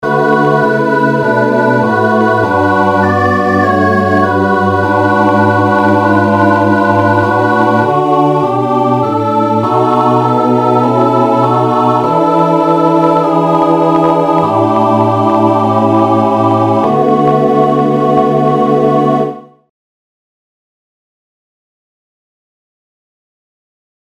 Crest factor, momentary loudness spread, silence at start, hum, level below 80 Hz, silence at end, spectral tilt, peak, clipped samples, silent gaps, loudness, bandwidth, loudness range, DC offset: 10 dB; 2 LU; 0 s; none; -54 dBFS; 4.7 s; -8 dB/octave; 0 dBFS; under 0.1%; none; -10 LUFS; 14 kHz; 2 LU; under 0.1%